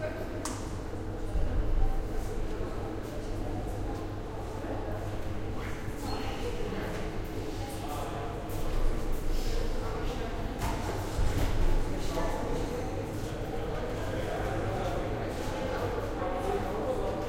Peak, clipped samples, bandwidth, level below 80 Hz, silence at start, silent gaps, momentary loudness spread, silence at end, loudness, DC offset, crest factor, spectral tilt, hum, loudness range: -14 dBFS; under 0.1%; 16 kHz; -34 dBFS; 0 s; none; 5 LU; 0 s; -35 LUFS; under 0.1%; 16 dB; -6 dB/octave; none; 3 LU